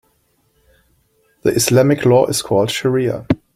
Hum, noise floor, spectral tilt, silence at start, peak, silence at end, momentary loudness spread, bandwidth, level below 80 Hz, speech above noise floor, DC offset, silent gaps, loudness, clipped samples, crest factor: none; -61 dBFS; -5 dB/octave; 1.45 s; 0 dBFS; 0.2 s; 6 LU; 16.5 kHz; -48 dBFS; 47 dB; under 0.1%; none; -15 LUFS; under 0.1%; 16 dB